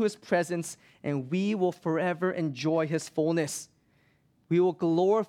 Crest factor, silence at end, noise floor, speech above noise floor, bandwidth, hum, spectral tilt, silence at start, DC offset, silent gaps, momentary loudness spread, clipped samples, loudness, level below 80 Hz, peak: 16 dB; 0.05 s; -67 dBFS; 39 dB; 15 kHz; none; -6 dB/octave; 0 s; under 0.1%; none; 9 LU; under 0.1%; -29 LUFS; -74 dBFS; -12 dBFS